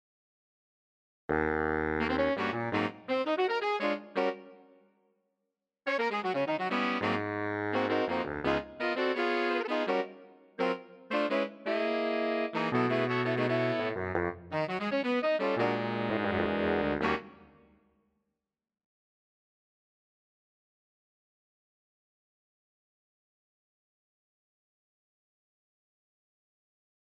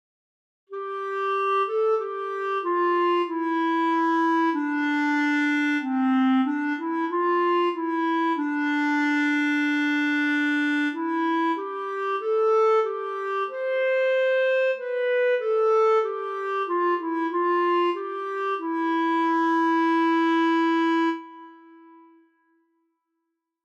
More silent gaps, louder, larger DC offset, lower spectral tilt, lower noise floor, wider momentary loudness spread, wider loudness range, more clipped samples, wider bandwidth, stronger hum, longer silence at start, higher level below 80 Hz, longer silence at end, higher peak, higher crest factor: neither; second, -31 LUFS vs -23 LUFS; neither; first, -6.5 dB/octave vs -3.5 dB/octave; first, -88 dBFS vs -80 dBFS; about the same, 5 LU vs 7 LU; about the same, 3 LU vs 2 LU; neither; first, 9.6 kHz vs 8.4 kHz; neither; first, 1.3 s vs 0.7 s; first, -60 dBFS vs -90 dBFS; first, 9.75 s vs 2.15 s; about the same, -14 dBFS vs -14 dBFS; first, 18 dB vs 10 dB